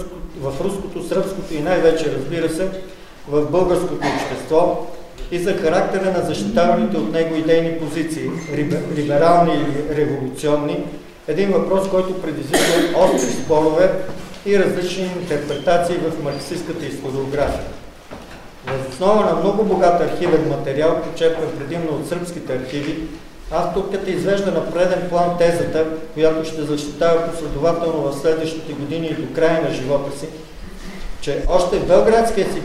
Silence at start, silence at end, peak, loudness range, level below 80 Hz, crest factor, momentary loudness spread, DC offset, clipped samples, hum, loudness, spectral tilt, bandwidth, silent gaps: 0 s; 0 s; 0 dBFS; 4 LU; -38 dBFS; 18 dB; 13 LU; under 0.1%; under 0.1%; none; -19 LUFS; -5.5 dB/octave; 15.5 kHz; none